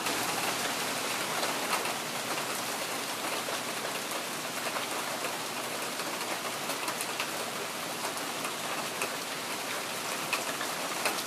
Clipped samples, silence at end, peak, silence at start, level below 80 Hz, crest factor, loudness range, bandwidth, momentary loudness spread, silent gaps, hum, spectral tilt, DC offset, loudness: under 0.1%; 0 s; -12 dBFS; 0 s; -76 dBFS; 22 dB; 2 LU; 15.5 kHz; 4 LU; none; none; -1 dB/octave; under 0.1%; -32 LUFS